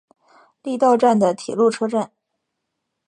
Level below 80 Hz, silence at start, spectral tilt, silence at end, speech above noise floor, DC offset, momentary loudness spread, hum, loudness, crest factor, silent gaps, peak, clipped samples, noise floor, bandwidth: -70 dBFS; 0.65 s; -6 dB/octave; 1 s; 60 dB; under 0.1%; 15 LU; none; -18 LUFS; 18 dB; none; -4 dBFS; under 0.1%; -78 dBFS; 10.5 kHz